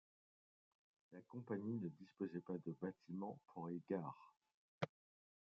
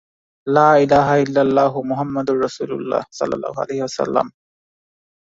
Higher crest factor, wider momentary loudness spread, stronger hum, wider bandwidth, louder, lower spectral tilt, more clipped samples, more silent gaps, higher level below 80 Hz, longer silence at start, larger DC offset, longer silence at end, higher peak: first, 24 dB vs 18 dB; about the same, 10 LU vs 11 LU; neither; second, 7 kHz vs 7.8 kHz; second, -49 LUFS vs -18 LUFS; about the same, -7.5 dB/octave vs -6.5 dB/octave; neither; first, 4.54-4.81 s vs none; second, -88 dBFS vs -54 dBFS; first, 1.1 s vs 0.45 s; neither; second, 0.65 s vs 1.1 s; second, -26 dBFS vs -2 dBFS